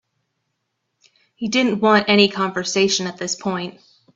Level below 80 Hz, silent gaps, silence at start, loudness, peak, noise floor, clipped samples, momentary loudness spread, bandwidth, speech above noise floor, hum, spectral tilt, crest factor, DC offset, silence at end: -62 dBFS; none; 1.4 s; -18 LUFS; 0 dBFS; -75 dBFS; under 0.1%; 12 LU; 7.8 kHz; 56 dB; none; -3.5 dB/octave; 20 dB; under 0.1%; 0.45 s